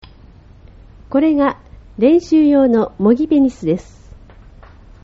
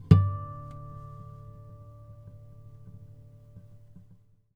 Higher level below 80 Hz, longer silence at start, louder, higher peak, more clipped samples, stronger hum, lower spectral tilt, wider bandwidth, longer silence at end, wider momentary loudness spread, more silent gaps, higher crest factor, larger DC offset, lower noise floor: first, -42 dBFS vs -50 dBFS; first, 1.1 s vs 0.1 s; first, -14 LUFS vs -29 LUFS; about the same, -2 dBFS vs -2 dBFS; neither; neither; second, -7 dB/octave vs -10 dB/octave; first, 7.6 kHz vs 5.2 kHz; second, 1.2 s vs 3.35 s; second, 9 LU vs 22 LU; neither; second, 14 dB vs 28 dB; neither; second, -42 dBFS vs -58 dBFS